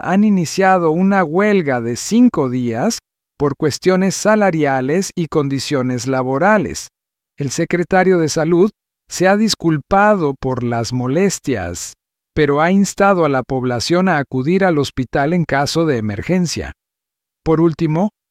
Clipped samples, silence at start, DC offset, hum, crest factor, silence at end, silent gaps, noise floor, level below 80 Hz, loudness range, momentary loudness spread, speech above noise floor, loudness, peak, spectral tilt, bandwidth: under 0.1%; 0.05 s; under 0.1%; none; 14 dB; 0.2 s; none; -83 dBFS; -44 dBFS; 3 LU; 8 LU; 68 dB; -16 LUFS; -2 dBFS; -5.5 dB/octave; 15.5 kHz